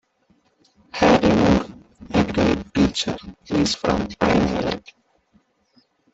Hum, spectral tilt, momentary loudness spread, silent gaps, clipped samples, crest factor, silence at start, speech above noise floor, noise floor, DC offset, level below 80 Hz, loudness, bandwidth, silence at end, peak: none; -5.5 dB/octave; 11 LU; none; under 0.1%; 18 dB; 0.95 s; 41 dB; -63 dBFS; under 0.1%; -40 dBFS; -20 LUFS; 8.2 kHz; 1.35 s; -4 dBFS